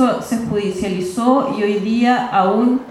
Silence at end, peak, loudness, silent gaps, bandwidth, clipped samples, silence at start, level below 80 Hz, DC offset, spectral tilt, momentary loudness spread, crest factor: 0 s; -2 dBFS; -17 LUFS; none; 13 kHz; under 0.1%; 0 s; -52 dBFS; under 0.1%; -6 dB/octave; 6 LU; 14 dB